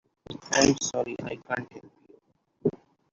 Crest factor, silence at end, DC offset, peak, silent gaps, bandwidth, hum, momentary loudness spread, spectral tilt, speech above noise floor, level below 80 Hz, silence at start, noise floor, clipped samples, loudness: 24 dB; 0.4 s; under 0.1%; -6 dBFS; none; 7.8 kHz; none; 21 LU; -3.5 dB/octave; 37 dB; -60 dBFS; 0.3 s; -64 dBFS; under 0.1%; -27 LUFS